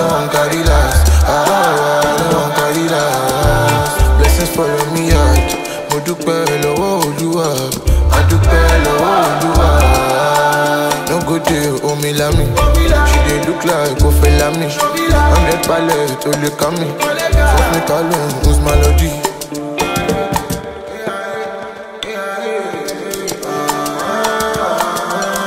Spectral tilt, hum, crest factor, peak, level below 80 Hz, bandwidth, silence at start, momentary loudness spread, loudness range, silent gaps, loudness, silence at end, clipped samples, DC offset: -5 dB/octave; none; 12 dB; 0 dBFS; -18 dBFS; 16.5 kHz; 0 s; 9 LU; 7 LU; none; -14 LUFS; 0 s; under 0.1%; under 0.1%